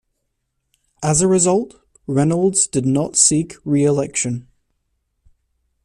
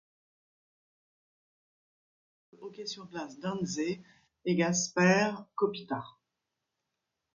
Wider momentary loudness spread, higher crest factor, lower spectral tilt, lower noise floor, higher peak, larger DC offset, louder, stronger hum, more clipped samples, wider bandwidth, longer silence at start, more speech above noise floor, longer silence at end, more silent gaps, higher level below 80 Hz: second, 11 LU vs 17 LU; about the same, 20 dB vs 24 dB; about the same, -4.5 dB/octave vs -4.5 dB/octave; second, -73 dBFS vs -86 dBFS; first, 0 dBFS vs -10 dBFS; neither; first, -17 LUFS vs -31 LUFS; neither; neither; first, 13.5 kHz vs 7.6 kHz; second, 1 s vs 2.6 s; about the same, 56 dB vs 55 dB; first, 1.45 s vs 1.25 s; neither; first, -50 dBFS vs -74 dBFS